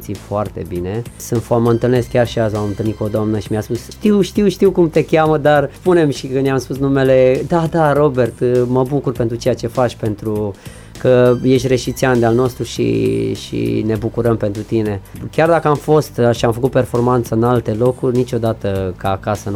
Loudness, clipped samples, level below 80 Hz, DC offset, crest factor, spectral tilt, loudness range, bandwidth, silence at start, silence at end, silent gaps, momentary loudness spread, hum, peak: -16 LUFS; under 0.1%; -38 dBFS; under 0.1%; 12 dB; -7 dB/octave; 3 LU; 16.5 kHz; 0 s; 0 s; none; 9 LU; none; -2 dBFS